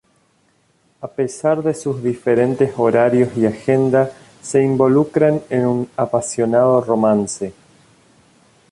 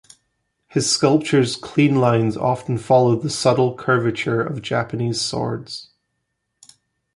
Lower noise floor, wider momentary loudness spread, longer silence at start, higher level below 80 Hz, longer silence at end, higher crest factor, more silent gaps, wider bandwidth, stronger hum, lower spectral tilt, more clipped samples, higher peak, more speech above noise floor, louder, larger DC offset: second, -60 dBFS vs -75 dBFS; about the same, 9 LU vs 9 LU; first, 1 s vs 0.75 s; about the same, -56 dBFS vs -56 dBFS; second, 1.2 s vs 1.35 s; about the same, 14 dB vs 18 dB; neither; about the same, 11.5 kHz vs 11.5 kHz; neither; first, -7 dB/octave vs -5 dB/octave; neither; about the same, -2 dBFS vs -4 dBFS; second, 43 dB vs 56 dB; about the same, -17 LUFS vs -19 LUFS; neither